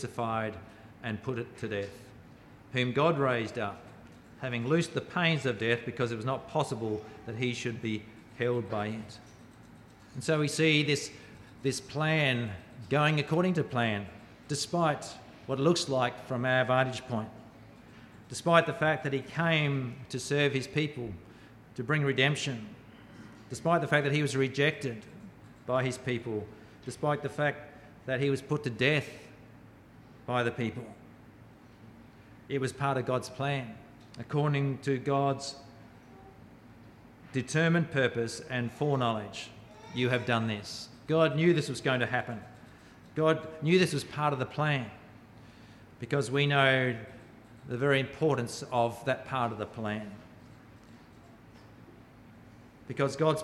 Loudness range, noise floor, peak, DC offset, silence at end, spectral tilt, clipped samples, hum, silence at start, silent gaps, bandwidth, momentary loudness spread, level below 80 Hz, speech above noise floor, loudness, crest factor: 6 LU; -54 dBFS; -8 dBFS; under 0.1%; 0 s; -5.5 dB/octave; under 0.1%; none; 0 s; none; 13.5 kHz; 19 LU; -66 dBFS; 24 dB; -30 LUFS; 22 dB